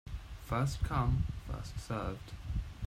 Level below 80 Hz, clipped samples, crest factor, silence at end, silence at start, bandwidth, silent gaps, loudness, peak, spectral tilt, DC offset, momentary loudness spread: -42 dBFS; under 0.1%; 16 dB; 0 s; 0.05 s; 15.5 kHz; none; -37 LUFS; -20 dBFS; -6.5 dB/octave; under 0.1%; 12 LU